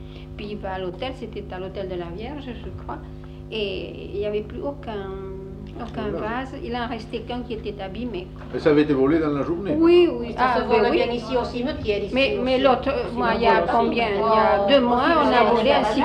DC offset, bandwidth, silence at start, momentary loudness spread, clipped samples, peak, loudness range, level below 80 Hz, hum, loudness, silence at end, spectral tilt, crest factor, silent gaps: under 0.1%; 9.6 kHz; 0 s; 16 LU; under 0.1%; -4 dBFS; 12 LU; -40 dBFS; 50 Hz at -60 dBFS; -22 LUFS; 0 s; -7 dB/octave; 18 dB; none